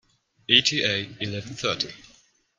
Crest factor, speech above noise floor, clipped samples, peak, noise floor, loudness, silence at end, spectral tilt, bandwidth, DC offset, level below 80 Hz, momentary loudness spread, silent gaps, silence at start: 26 dB; 34 dB; under 0.1%; -2 dBFS; -59 dBFS; -23 LUFS; 0.55 s; -2.5 dB/octave; 12 kHz; under 0.1%; -62 dBFS; 14 LU; none; 0.5 s